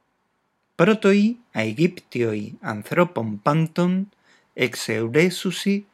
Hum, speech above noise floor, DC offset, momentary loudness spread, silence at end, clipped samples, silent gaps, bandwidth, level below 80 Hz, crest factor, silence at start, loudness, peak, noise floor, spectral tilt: none; 49 dB; under 0.1%; 9 LU; 0.1 s; under 0.1%; none; 14.5 kHz; -72 dBFS; 20 dB; 0.8 s; -22 LUFS; -2 dBFS; -71 dBFS; -6 dB/octave